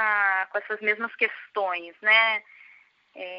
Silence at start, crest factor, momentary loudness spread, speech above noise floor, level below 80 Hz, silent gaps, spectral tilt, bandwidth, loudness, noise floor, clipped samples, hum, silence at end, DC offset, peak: 0 s; 20 dB; 11 LU; 31 dB; -88 dBFS; none; 3 dB/octave; 5.6 kHz; -24 LUFS; -56 dBFS; under 0.1%; none; 0 s; under 0.1%; -6 dBFS